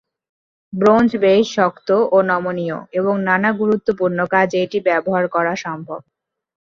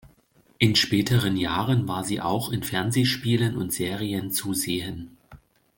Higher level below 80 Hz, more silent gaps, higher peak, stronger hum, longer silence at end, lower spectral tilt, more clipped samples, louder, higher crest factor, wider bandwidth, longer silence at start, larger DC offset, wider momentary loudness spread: about the same, -58 dBFS vs -54 dBFS; neither; about the same, -2 dBFS vs -4 dBFS; neither; first, 0.65 s vs 0.4 s; first, -6.5 dB/octave vs -4.5 dB/octave; neither; first, -17 LUFS vs -24 LUFS; about the same, 16 dB vs 20 dB; second, 7.4 kHz vs 17 kHz; first, 0.75 s vs 0.05 s; neither; first, 11 LU vs 7 LU